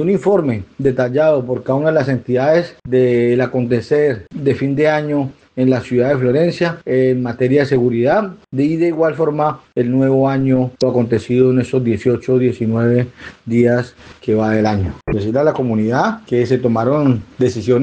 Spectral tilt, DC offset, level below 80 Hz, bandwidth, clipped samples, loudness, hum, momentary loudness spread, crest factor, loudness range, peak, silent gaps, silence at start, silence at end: -8 dB/octave; under 0.1%; -46 dBFS; 8.8 kHz; under 0.1%; -16 LUFS; none; 5 LU; 14 dB; 1 LU; -2 dBFS; none; 0 s; 0 s